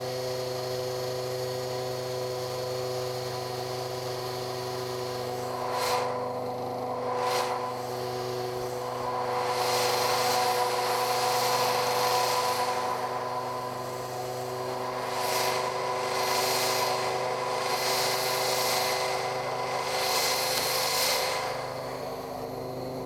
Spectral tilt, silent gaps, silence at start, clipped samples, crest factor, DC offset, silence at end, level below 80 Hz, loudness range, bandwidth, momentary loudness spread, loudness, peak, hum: -2.5 dB/octave; none; 0 s; under 0.1%; 16 dB; under 0.1%; 0 s; -62 dBFS; 6 LU; over 20 kHz; 8 LU; -29 LUFS; -14 dBFS; 50 Hz at -65 dBFS